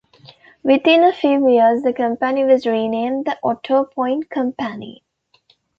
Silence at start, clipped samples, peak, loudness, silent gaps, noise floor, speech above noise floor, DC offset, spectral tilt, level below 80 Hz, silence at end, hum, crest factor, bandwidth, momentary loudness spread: 0.65 s; under 0.1%; -2 dBFS; -17 LUFS; none; -59 dBFS; 42 dB; under 0.1%; -6.5 dB/octave; -64 dBFS; 0.85 s; none; 16 dB; 6.6 kHz; 11 LU